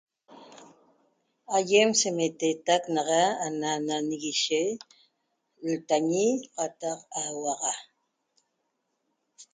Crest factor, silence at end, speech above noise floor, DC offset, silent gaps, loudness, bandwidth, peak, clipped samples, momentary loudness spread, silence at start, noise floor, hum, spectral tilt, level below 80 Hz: 20 dB; 0.1 s; 51 dB; under 0.1%; none; -27 LUFS; 9.6 kHz; -10 dBFS; under 0.1%; 10 LU; 0.3 s; -78 dBFS; none; -2.5 dB/octave; -78 dBFS